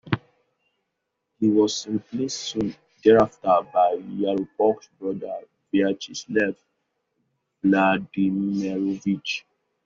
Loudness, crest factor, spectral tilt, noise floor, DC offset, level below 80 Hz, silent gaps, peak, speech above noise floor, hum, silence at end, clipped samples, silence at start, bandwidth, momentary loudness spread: -23 LUFS; 20 dB; -4.5 dB/octave; -79 dBFS; under 0.1%; -60 dBFS; none; -4 dBFS; 57 dB; none; 0.45 s; under 0.1%; 0.05 s; 7.6 kHz; 12 LU